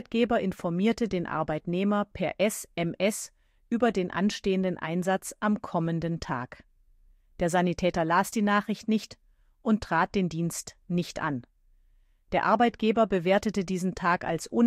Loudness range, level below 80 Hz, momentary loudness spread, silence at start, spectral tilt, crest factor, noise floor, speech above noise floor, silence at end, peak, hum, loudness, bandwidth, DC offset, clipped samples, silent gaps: 3 LU; -54 dBFS; 8 LU; 0.1 s; -5.5 dB/octave; 18 dB; -62 dBFS; 35 dB; 0 s; -10 dBFS; none; -28 LUFS; 15.5 kHz; under 0.1%; under 0.1%; none